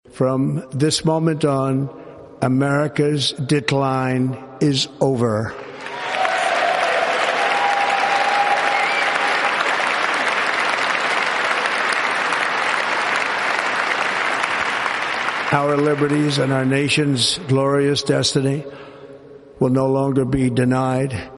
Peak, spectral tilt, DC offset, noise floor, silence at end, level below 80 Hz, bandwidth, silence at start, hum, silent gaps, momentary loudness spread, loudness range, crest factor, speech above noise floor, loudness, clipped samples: 0 dBFS; -4.5 dB/octave; under 0.1%; -41 dBFS; 0 s; -52 dBFS; 11.5 kHz; 0.15 s; none; none; 5 LU; 3 LU; 18 dB; 22 dB; -18 LUFS; under 0.1%